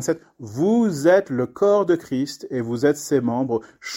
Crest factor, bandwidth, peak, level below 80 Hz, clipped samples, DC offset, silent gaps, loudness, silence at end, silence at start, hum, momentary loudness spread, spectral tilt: 16 dB; 16.5 kHz; -4 dBFS; -62 dBFS; under 0.1%; under 0.1%; none; -21 LUFS; 0 s; 0 s; none; 10 LU; -6 dB/octave